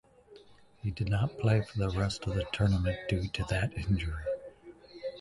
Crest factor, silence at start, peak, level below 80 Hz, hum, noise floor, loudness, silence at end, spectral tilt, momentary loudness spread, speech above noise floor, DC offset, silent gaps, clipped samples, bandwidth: 18 dB; 0.3 s; -14 dBFS; -44 dBFS; none; -56 dBFS; -32 LUFS; 0 s; -6.5 dB/octave; 11 LU; 26 dB; under 0.1%; none; under 0.1%; 11.5 kHz